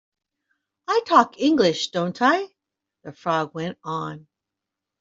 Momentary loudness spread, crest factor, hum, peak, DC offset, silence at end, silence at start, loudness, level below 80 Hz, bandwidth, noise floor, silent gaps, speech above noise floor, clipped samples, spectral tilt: 16 LU; 20 dB; none; -2 dBFS; under 0.1%; 0.8 s; 0.9 s; -22 LUFS; -68 dBFS; 7.8 kHz; -85 dBFS; none; 64 dB; under 0.1%; -5 dB/octave